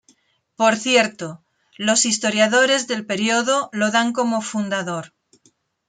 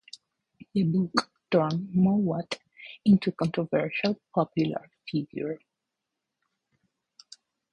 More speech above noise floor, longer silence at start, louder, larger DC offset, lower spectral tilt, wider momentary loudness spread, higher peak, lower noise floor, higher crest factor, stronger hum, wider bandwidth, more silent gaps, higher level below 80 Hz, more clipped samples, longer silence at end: second, 42 dB vs 59 dB; second, 0.6 s vs 0.75 s; first, -19 LUFS vs -27 LUFS; neither; second, -2.5 dB/octave vs -7 dB/octave; second, 9 LU vs 14 LU; about the same, -4 dBFS vs -6 dBFS; second, -61 dBFS vs -85 dBFS; second, 18 dB vs 24 dB; neither; about the same, 9.6 kHz vs 10.5 kHz; neither; second, -70 dBFS vs -64 dBFS; neither; second, 0.8 s vs 2.15 s